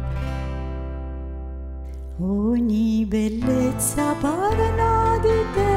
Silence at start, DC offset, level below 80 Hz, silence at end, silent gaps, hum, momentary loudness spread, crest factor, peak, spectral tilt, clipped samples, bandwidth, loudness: 0 s; under 0.1%; -32 dBFS; 0 s; none; none; 14 LU; 14 dB; -8 dBFS; -6 dB/octave; under 0.1%; 16 kHz; -22 LUFS